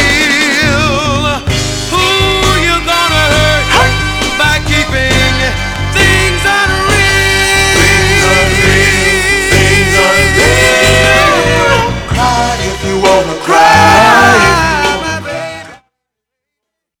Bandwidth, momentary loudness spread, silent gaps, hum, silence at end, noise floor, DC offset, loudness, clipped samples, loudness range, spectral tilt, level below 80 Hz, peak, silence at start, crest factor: over 20 kHz; 7 LU; none; none; 1.25 s; -76 dBFS; under 0.1%; -8 LUFS; 0.7%; 3 LU; -3.5 dB/octave; -22 dBFS; 0 dBFS; 0 s; 10 dB